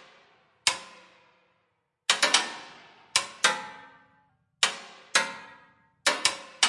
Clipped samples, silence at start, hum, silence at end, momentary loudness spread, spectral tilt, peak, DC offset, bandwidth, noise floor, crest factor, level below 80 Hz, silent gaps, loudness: under 0.1%; 0.65 s; none; 0 s; 19 LU; 1.5 dB/octave; -4 dBFS; under 0.1%; 11.5 kHz; -75 dBFS; 28 dB; -78 dBFS; none; -26 LUFS